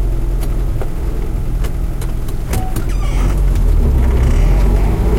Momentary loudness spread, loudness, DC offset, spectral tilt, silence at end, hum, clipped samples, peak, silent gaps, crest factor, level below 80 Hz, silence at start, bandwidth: 8 LU; -18 LUFS; under 0.1%; -7 dB/octave; 0 s; none; under 0.1%; -2 dBFS; none; 10 dB; -14 dBFS; 0 s; 15.5 kHz